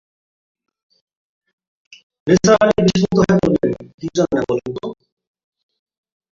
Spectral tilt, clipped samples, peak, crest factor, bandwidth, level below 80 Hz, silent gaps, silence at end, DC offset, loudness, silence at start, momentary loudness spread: -6 dB/octave; under 0.1%; -2 dBFS; 18 dB; 7.6 kHz; -46 dBFS; 3.94-3.98 s; 1.4 s; under 0.1%; -16 LUFS; 2.25 s; 15 LU